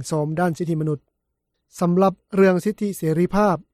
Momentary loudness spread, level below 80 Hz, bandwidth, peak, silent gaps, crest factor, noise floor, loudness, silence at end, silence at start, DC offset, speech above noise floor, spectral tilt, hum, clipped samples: 7 LU; -50 dBFS; 15 kHz; -6 dBFS; none; 16 dB; -77 dBFS; -21 LUFS; 0.1 s; 0 s; under 0.1%; 56 dB; -7.5 dB/octave; none; under 0.1%